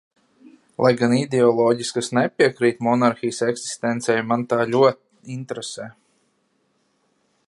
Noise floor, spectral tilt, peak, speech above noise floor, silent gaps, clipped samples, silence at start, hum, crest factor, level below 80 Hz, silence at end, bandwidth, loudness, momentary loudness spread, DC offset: -67 dBFS; -5 dB/octave; -2 dBFS; 47 dB; none; under 0.1%; 0.8 s; none; 20 dB; -68 dBFS; 1.55 s; 11.5 kHz; -20 LUFS; 16 LU; under 0.1%